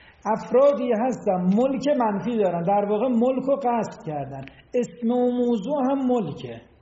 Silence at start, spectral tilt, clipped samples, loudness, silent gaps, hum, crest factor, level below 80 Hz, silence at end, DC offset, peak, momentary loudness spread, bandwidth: 0.25 s; -7 dB/octave; under 0.1%; -23 LUFS; none; none; 14 dB; -60 dBFS; 0.2 s; under 0.1%; -8 dBFS; 12 LU; 7.6 kHz